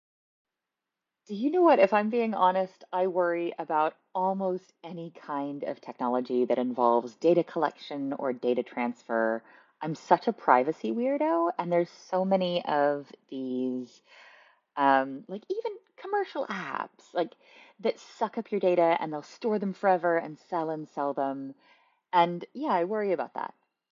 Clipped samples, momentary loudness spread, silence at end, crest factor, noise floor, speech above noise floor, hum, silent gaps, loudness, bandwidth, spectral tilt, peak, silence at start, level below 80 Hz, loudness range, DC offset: under 0.1%; 13 LU; 0.45 s; 22 dB; -88 dBFS; 60 dB; none; none; -28 LUFS; 7.4 kHz; -7 dB/octave; -6 dBFS; 1.3 s; -82 dBFS; 5 LU; under 0.1%